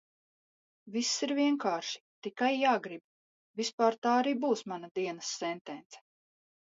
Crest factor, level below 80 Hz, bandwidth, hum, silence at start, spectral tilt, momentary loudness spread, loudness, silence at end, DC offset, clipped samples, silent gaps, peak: 20 dB; -86 dBFS; 8 kHz; none; 0.85 s; -3 dB/octave; 15 LU; -32 LUFS; 0.75 s; under 0.1%; under 0.1%; 2.00-2.22 s, 3.04-3.54 s, 3.73-3.78 s, 3.98-4.02 s, 4.91-4.95 s, 5.61-5.65 s, 5.86-5.90 s; -14 dBFS